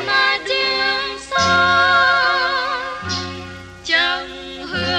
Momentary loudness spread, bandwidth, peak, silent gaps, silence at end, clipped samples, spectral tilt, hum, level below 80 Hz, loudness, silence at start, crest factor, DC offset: 17 LU; 10.5 kHz; -4 dBFS; none; 0 s; under 0.1%; -2.5 dB/octave; none; -48 dBFS; -16 LUFS; 0 s; 14 dB; under 0.1%